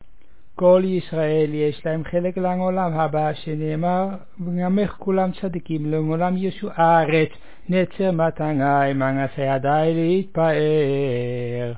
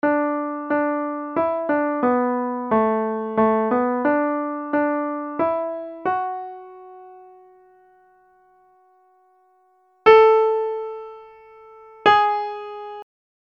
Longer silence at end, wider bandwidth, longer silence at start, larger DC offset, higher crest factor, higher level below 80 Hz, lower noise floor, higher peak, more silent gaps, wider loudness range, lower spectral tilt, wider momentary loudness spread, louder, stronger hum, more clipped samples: second, 0 s vs 0.35 s; second, 4 kHz vs 6.6 kHz; first, 0.55 s vs 0.05 s; first, 2% vs under 0.1%; about the same, 16 dB vs 20 dB; first, -52 dBFS vs -62 dBFS; second, -55 dBFS vs -60 dBFS; second, -6 dBFS vs -2 dBFS; neither; second, 3 LU vs 10 LU; first, -11.5 dB/octave vs -7 dB/octave; second, 9 LU vs 18 LU; about the same, -21 LUFS vs -20 LUFS; neither; neither